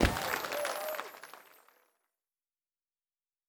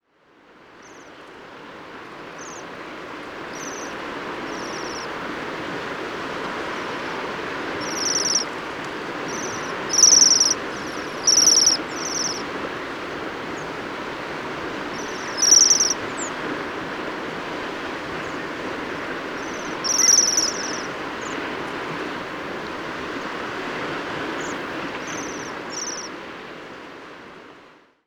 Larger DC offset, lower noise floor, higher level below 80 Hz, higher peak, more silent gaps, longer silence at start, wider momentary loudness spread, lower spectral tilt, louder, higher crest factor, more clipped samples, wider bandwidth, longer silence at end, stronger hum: neither; first, under -90 dBFS vs -55 dBFS; first, -46 dBFS vs -56 dBFS; second, -12 dBFS vs -4 dBFS; neither; second, 0 s vs 0.5 s; second, 19 LU vs 22 LU; first, -4 dB/octave vs -0.5 dB/octave; second, -35 LUFS vs -21 LUFS; first, 28 dB vs 22 dB; neither; about the same, over 20 kHz vs over 20 kHz; first, 2.05 s vs 0.35 s; neither